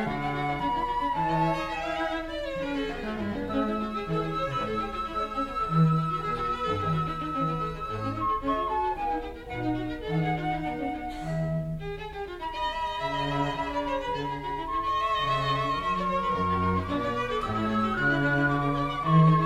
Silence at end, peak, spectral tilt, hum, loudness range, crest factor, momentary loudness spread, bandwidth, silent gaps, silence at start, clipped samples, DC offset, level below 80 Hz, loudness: 0 s; -10 dBFS; -7 dB/octave; none; 4 LU; 18 dB; 8 LU; 11 kHz; none; 0 s; under 0.1%; under 0.1%; -44 dBFS; -28 LUFS